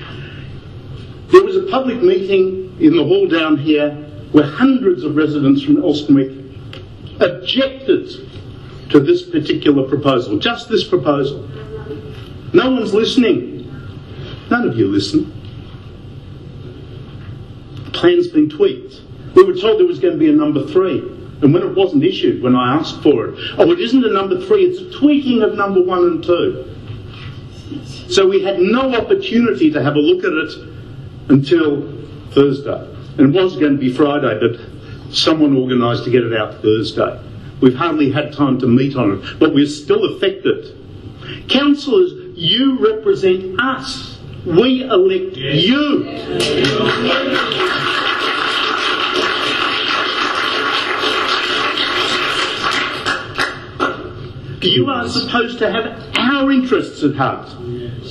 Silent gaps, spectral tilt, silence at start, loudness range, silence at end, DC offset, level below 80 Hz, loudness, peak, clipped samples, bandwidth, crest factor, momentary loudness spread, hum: none; -6 dB/octave; 0 s; 4 LU; 0 s; under 0.1%; -46 dBFS; -15 LUFS; 0 dBFS; under 0.1%; 11.5 kHz; 16 dB; 19 LU; none